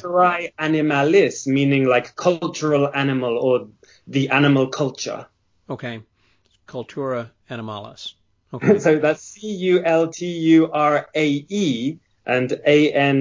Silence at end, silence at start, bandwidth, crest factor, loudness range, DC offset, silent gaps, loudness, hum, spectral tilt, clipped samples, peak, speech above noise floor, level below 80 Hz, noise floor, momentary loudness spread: 0 s; 0.05 s; 7.6 kHz; 18 dB; 10 LU; under 0.1%; none; -19 LUFS; none; -6 dB/octave; under 0.1%; -2 dBFS; 43 dB; -66 dBFS; -62 dBFS; 17 LU